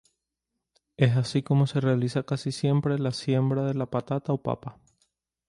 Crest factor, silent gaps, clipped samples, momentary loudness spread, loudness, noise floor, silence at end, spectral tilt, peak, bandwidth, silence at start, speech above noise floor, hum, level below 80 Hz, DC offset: 20 dB; none; under 0.1%; 6 LU; -26 LUFS; -84 dBFS; 0.8 s; -7.5 dB/octave; -6 dBFS; 11 kHz; 1 s; 59 dB; none; -62 dBFS; under 0.1%